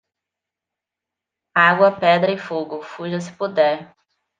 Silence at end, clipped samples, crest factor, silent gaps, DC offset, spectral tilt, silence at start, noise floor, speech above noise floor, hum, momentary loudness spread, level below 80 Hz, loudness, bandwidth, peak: 0.55 s; under 0.1%; 20 dB; none; under 0.1%; -5.5 dB/octave; 1.55 s; -86 dBFS; 67 dB; none; 14 LU; -72 dBFS; -18 LUFS; 8.8 kHz; -2 dBFS